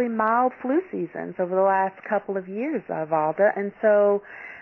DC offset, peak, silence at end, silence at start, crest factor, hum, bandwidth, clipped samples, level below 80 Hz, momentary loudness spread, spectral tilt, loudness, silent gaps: under 0.1%; -8 dBFS; 0 s; 0 s; 16 dB; none; 3.2 kHz; under 0.1%; -72 dBFS; 10 LU; -10 dB/octave; -24 LUFS; none